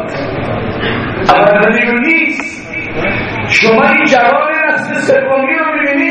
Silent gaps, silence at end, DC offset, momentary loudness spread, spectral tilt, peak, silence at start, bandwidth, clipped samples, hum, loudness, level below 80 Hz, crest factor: none; 0 s; under 0.1%; 10 LU; -5 dB/octave; 0 dBFS; 0 s; 9.6 kHz; 0.2%; none; -11 LUFS; -38 dBFS; 12 dB